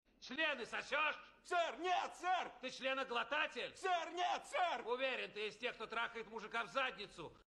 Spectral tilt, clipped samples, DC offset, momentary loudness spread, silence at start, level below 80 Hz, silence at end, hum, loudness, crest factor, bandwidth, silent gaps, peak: -2 dB/octave; under 0.1%; under 0.1%; 6 LU; 0.2 s; -78 dBFS; 0.1 s; none; -41 LUFS; 18 dB; 12 kHz; none; -24 dBFS